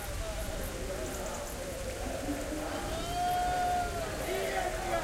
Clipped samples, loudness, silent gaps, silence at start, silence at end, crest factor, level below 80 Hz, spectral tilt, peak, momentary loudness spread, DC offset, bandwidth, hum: under 0.1%; -35 LUFS; none; 0 s; 0 s; 14 dB; -42 dBFS; -4 dB/octave; -20 dBFS; 7 LU; under 0.1%; 16 kHz; none